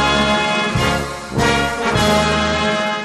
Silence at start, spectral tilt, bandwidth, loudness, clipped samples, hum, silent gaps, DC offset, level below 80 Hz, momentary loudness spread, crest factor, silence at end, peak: 0 s; -4 dB/octave; 13.5 kHz; -16 LUFS; under 0.1%; none; none; under 0.1%; -32 dBFS; 4 LU; 14 dB; 0 s; -2 dBFS